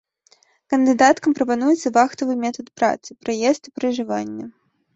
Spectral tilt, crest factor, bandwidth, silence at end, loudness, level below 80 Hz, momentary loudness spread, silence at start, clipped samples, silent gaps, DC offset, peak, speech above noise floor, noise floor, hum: -4 dB/octave; 20 dB; 8 kHz; 0.45 s; -20 LUFS; -64 dBFS; 12 LU; 0.7 s; under 0.1%; none; under 0.1%; -2 dBFS; 39 dB; -58 dBFS; none